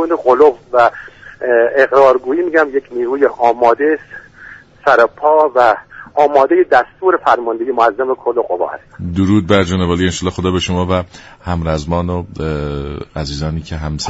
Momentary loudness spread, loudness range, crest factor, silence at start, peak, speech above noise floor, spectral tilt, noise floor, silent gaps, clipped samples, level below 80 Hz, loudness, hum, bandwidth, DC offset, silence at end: 12 LU; 5 LU; 14 dB; 0 s; 0 dBFS; 24 dB; -6 dB/octave; -38 dBFS; none; under 0.1%; -36 dBFS; -14 LUFS; none; 8 kHz; under 0.1%; 0 s